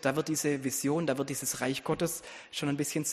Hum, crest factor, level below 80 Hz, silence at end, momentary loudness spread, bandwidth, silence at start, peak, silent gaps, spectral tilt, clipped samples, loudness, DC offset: none; 20 dB; -66 dBFS; 0 s; 4 LU; 15 kHz; 0 s; -12 dBFS; none; -4 dB/octave; under 0.1%; -32 LUFS; under 0.1%